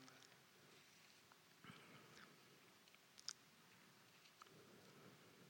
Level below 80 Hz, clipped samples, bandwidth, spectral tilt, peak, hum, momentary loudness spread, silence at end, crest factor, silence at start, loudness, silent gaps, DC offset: under -90 dBFS; under 0.1%; over 20 kHz; -2 dB/octave; -28 dBFS; none; 12 LU; 0 s; 38 dB; 0 s; -63 LUFS; none; under 0.1%